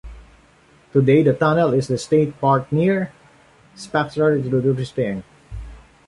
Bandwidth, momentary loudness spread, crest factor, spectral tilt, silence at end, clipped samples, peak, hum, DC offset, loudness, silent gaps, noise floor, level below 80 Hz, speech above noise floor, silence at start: 11.5 kHz; 19 LU; 16 dB; -7.5 dB/octave; 0.3 s; under 0.1%; -4 dBFS; none; under 0.1%; -19 LUFS; none; -53 dBFS; -44 dBFS; 35 dB; 0.05 s